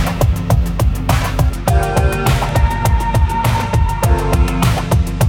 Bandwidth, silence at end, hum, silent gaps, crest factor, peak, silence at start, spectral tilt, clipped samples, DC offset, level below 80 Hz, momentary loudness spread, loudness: 18.5 kHz; 0 s; none; none; 14 dB; 0 dBFS; 0 s; -6 dB/octave; under 0.1%; under 0.1%; -18 dBFS; 2 LU; -15 LUFS